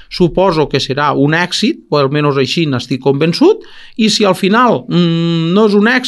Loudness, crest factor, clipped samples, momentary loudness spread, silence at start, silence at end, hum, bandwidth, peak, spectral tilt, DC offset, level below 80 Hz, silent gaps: -12 LUFS; 12 dB; under 0.1%; 5 LU; 0.1 s; 0 s; none; 12.5 kHz; 0 dBFS; -5.5 dB/octave; under 0.1%; -42 dBFS; none